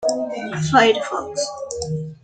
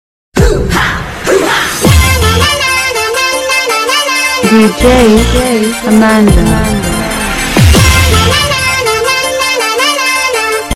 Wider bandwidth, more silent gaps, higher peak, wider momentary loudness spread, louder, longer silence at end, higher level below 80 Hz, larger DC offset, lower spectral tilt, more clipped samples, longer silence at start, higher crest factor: second, 9.4 kHz vs 16.5 kHz; neither; about the same, -2 dBFS vs 0 dBFS; first, 12 LU vs 6 LU; second, -20 LUFS vs -8 LUFS; about the same, 0.1 s vs 0 s; second, -54 dBFS vs -18 dBFS; neither; about the same, -4 dB/octave vs -4 dB/octave; second, under 0.1% vs 0.6%; second, 0 s vs 0.35 s; first, 20 dB vs 8 dB